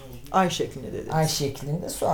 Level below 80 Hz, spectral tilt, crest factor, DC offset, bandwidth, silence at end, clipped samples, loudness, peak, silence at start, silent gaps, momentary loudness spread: -48 dBFS; -4.5 dB/octave; 18 dB; under 0.1%; over 20 kHz; 0 s; under 0.1%; -26 LUFS; -8 dBFS; 0 s; none; 8 LU